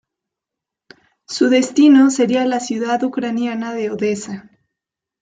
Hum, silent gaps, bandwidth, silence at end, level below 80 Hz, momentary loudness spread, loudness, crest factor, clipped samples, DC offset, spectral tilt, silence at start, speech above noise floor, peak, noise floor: none; none; 9.4 kHz; 0.8 s; -66 dBFS; 14 LU; -16 LUFS; 16 dB; under 0.1%; under 0.1%; -4.5 dB/octave; 1.3 s; 69 dB; -2 dBFS; -84 dBFS